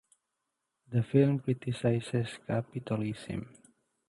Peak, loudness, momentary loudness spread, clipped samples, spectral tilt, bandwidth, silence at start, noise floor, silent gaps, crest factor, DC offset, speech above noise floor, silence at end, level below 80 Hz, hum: -12 dBFS; -32 LUFS; 13 LU; under 0.1%; -8 dB/octave; 11.5 kHz; 0.9 s; -84 dBFS; none; 20 dB; under 0.1%; 54 dB; 0.6 s; -64 dBFS; none